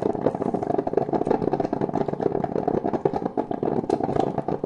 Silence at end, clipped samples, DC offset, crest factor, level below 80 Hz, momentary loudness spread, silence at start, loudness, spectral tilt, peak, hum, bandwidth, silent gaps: 0 s; under 0.1%; under 0.1%; 18 dB; -52 dBFS; 3 LU; 0 s; -25 LUFS; -9 dB/octave; -6 dBFS; none; 10 kHz; none